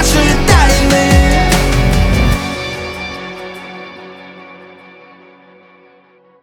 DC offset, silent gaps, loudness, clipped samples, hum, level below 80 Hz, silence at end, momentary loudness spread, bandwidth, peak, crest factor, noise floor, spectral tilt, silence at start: under 0.1%; none; -12 LUFS; under 0.1%; none; -18 dBFS; 1.75 s; 23 LU; 19 kHz; 0 dBFS; 14 dB; -48 dBFS; -4.5 dB/octave; 0 s